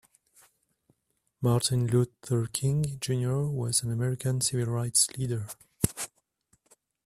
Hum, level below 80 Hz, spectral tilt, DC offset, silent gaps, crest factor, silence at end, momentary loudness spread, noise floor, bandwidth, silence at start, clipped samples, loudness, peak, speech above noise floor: none; -56 dBFS; -4.5 dB/octave; under 0.1%; none; 22 dB; 1 s; 8 LU; -76 dBFS; 15 kHz; 1.4 s; under 0.1%; -28 LUFS; -8 dBFS; 49 dB